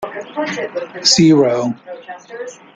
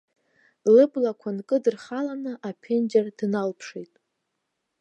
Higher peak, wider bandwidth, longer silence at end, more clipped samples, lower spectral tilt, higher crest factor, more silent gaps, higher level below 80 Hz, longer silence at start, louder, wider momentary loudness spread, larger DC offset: first, 0 dBFS vs -8 dBFS; first, 9.4 kHz vs 8.4 kHz; second, 0.2 s vs 0.95 s; neither; second, -4 dB/octave vs -7 dB/octave; about the same, 16 dB vs 18 dB; neither; first, -54 dBFS vs -80 dBFS; second, 0 s vs 0.65 s; first, -15 LUFS vs -24 LUFS; first, 22 LU vs 17 LU; neither